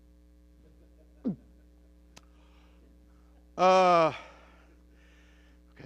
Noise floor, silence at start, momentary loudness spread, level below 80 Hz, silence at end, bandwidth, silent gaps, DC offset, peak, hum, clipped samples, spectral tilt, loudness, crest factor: -58 dBFS; 1.25 s; 23 LU; -58 dBFS; 1.65 s; 9.2 kHz; none; under 0.1%; -12 dBFS; none; under 0.1%; -5.5 dB/octave; -25 LUFS; 20 dB